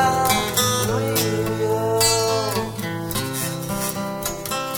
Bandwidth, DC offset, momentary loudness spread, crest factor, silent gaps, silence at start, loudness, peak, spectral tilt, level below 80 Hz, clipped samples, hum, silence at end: over 20 kHz; under 0.1%; 9 LU; 18 dB; none; 0 s; -21 LUFS; -4 dBFS; -3.5 dB/octave; -44 dBFS; under 0.1%; none; 0 s